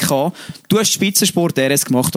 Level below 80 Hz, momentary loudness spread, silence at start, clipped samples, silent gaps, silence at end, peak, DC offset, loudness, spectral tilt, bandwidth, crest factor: -54 dBFS; 7 LU; 0 s; under 0.1%; none; 0 s; -2 dBFS; under 0.1%; -15 LUFS; -3.5 dB/octave; over 20 kHz; 14 dB